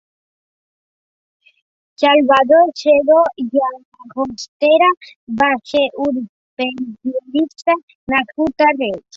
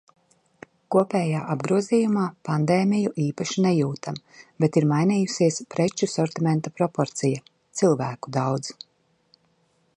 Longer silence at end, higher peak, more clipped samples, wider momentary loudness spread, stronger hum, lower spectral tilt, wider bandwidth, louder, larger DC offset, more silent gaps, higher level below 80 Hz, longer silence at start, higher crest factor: second, 0.2 s vs 1.25 s; first, -2 dBFS vs -6 dBFS; neither; first, 13 LU vs 7 LU; neither; second, -4.5 dB/octave vs -6 dB/octave; second, 7.8 kHz vs 11 kHz; first, -16 LUFS vs -24 LUFS; neither; first, 3.85-3.92 s, 4.48-4.60 s, 4.97-5.01 s, 5.16-5.27 s, 6.29-6.57 s, 7.83-7.88 s, 7.95-8.07 s vs none; first, -56 dBFS vs -68 dBFS; first, 2 s vs 0.9 s; about the same, 16 dB vs 18 dB